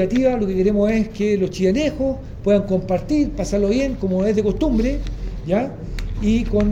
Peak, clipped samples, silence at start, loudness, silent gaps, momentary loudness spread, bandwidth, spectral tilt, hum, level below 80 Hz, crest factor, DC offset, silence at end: -4 dBFS; under 0.1%; 0 s; -20 LUFS; none; 7 LU; 10 kHz; -7 dB/octave; none; -30 dBFS; 14 dB; under 0.1%; 0 s